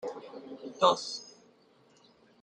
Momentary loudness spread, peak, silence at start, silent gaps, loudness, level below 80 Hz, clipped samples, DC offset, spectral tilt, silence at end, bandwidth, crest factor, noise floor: 20 LU; -8 dBFS; 0 s; none; -30 LUFS; -80 dBFS; under 0.1%; under 0.1%; -3 dB/octave; 1.1 s; 9.8 kHz; 26 dB; -63 dBFS